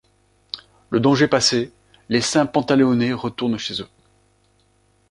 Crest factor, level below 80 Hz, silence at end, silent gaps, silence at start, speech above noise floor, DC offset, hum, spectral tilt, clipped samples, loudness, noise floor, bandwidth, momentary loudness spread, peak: 20 dB; -56 dBFS; 1.25 s; none; 0.55 s; 42 dB; under 0.1%; 50 Hz at -55 dBFS; -4.5 dB/octave; under 0.1%; -19 LUFS; -61 dBFS; 11.5 kHz; 18 LU; -2 dBFS